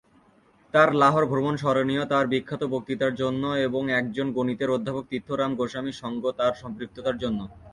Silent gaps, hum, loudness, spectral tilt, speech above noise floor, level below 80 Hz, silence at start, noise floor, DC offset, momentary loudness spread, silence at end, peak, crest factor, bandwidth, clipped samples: none; none; -25 LUFS; -6.5 dB/octave; 34 dB; -58 dBFS; 0.75 s; -59 dBFS; under 0.1%; 11 LU; 0 s; -4 dBFS; 20 dB; 11 kHz; under 0.1%